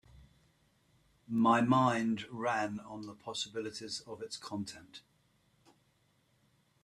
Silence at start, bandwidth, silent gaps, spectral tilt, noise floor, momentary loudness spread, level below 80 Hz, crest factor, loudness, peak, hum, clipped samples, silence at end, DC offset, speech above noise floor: 0.15 s; 12 kHz; none; -5 dB/octave; -73 dBFS; 18 LU; -72 dBFS; 22 dB; -34 LUFS; -16 dBFS; none; under 0.1%; 1.85 s; under 0.1%; 39 dB